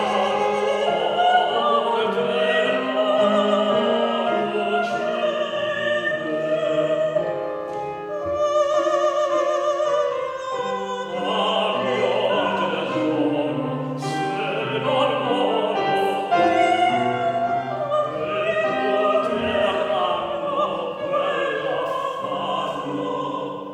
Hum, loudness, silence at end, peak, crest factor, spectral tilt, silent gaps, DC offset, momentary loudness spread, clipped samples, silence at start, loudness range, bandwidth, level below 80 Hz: none; -22 LUFS; 0 s; -6 dBFS; 16 dB; -5 dB/octave; none; under 0.1%; 7 LU; under 0.1%; 0 s; 3 LU; 11 kHz; -62 dBFS